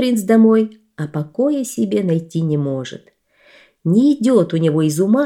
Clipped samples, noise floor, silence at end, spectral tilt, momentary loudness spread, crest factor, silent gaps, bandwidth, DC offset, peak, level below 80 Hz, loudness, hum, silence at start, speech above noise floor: under 0.1%; -51 dBFS; 0 s; -7 dB/octave; 13 LU; 14 dB; none; 16 kHz; under 0.1%; -2 dBFS; -66 dBFS; -17 LUFS; none; 0 s; 35 dB